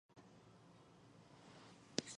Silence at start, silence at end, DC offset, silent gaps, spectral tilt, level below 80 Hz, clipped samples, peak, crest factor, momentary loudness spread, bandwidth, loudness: 0.1 s; 0 s; under 0.1%; none; -3 dB/octave; -84 dBFS; under 0.1%; -16 dBFS; 38 dB; 19 LU; 10.5 kHz; -56 LUFS